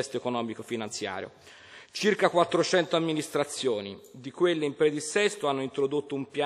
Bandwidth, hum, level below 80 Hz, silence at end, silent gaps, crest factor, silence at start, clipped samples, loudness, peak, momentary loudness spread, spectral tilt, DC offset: 14.5 kHz; none; -76 dBFS; 0 s; none; 20 dB; 0 s; under 0.1%; -28 LUFS; -8 dBFS; 16 LU; -4 dB/octave; under 0.1%